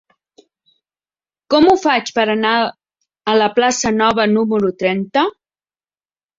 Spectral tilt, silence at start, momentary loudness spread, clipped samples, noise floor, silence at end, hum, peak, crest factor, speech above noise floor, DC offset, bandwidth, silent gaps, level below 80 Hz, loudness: -4 dB/octave; 1.5 s; 6 LU; under 0.1%; under -90 dBFS; 1.1 s; none; 0 dBFS; 16 dB; over 75 dB; under 0.1%; 7.8 kHz; none; -54 dBFS; -15 LUFS